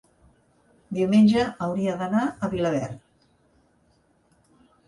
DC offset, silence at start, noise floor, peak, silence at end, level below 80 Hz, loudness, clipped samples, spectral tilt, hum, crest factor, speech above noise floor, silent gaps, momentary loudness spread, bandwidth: under 0.1%; 0.9 s; -64 dBFS; -8 dBFS; 1.9 s; -58 dBFS; -23 LUFS; under 0.1%; -7 dB/octave; none; 18 dB; 42 dB; none; 15 LU; 11 kHz